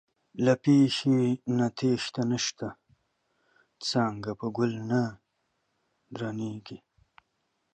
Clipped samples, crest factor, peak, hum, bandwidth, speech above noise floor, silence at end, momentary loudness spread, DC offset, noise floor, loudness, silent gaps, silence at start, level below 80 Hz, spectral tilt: under 0.1%; 18 dB; -12 dBFS; none; 9.2 kHz; 50 dB; 0.95 s; 17 LU; under 0.1%; -77 dBFS; -28 LUFS; none; 0.35 s; -68 dBFS; -5.5 dB/octave